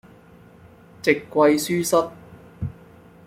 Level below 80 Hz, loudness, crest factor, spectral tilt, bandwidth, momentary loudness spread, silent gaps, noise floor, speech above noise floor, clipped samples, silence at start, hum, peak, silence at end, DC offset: -54 dBFS; -21 LUFS; 20 dB; -4.5 dB/octave; 16.5 kHz; 16 LU; none; -49 dBFS; 29 dB; under 0.1%; 1.05 s; none; -2 dBFS; 0.55 s; under 0.1%